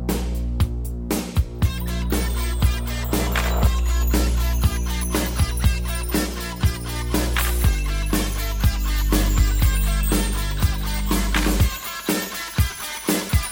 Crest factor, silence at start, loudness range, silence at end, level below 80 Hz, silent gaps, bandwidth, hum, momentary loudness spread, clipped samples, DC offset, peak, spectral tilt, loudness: 14 dB; 0 s; 2 LU; 0 s; -22 dBFS; none; 17 kHz; none; 5 LU; under 0.1%; under 0.1%; -6 dBFS; -4.5 dB/octave; -23 LUFS